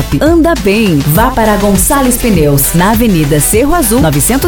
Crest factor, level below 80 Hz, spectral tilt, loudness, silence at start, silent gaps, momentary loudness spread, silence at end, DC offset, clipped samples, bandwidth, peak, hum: 8 dB; -20 dBFS; -5 dB/octave; -8 LUFS; 0 s; none; 1 LU; 0 s; 1%; 0.2%; over 20 kHz; 0 dBFS; none